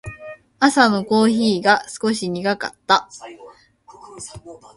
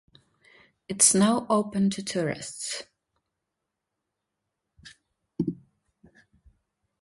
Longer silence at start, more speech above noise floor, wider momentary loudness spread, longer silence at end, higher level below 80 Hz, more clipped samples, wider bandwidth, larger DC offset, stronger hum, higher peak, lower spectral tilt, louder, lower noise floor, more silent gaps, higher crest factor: second, 0.05 s vs 0.9 s; second, 29 dB vs 59 dB; first, 22 LU vs 18 LU; second, 0.2 s vs 1.45 s; first, -56 dBFS vs -64 dBFS; neither; about the same, 11.5 kHz vs 12 kHz; neither; neither; first, 0 dBFS vs -4 dBFS; about the same, -4 dB/octave vs -3.5 dB/octave; first, -18 LUFS vs -25 LUFS; second, -48 dBFS vs -84 dBFS; neither; second, 20 dB vs 26 dB